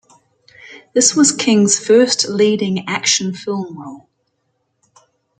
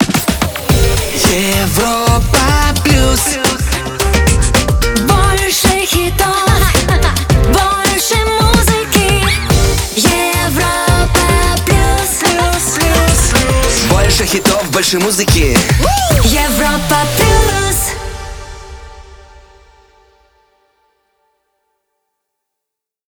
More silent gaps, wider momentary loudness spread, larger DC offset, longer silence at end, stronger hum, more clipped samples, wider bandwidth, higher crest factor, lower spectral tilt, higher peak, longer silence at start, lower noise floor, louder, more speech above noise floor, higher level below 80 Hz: neither; first, 13 LU vs 3 LU; neither; second, 1.4 s vs 3.95 s; neither; neither; second, 9.6 kHz vs over 20 kHz; first, 18 dB vs 12 dB; about the same, -3 dB/octave vs -3.5 dB/octave; about the same, 0 dBFS vs 0 dBFS; first, 0.65 s vs 0 s; second, -68 dBFS vs -81 dBFS; second, -14 LUFS vs -11 LUFS; second, 53 dB vs 69 dB; second, -64 dBFS vs -18 dBFS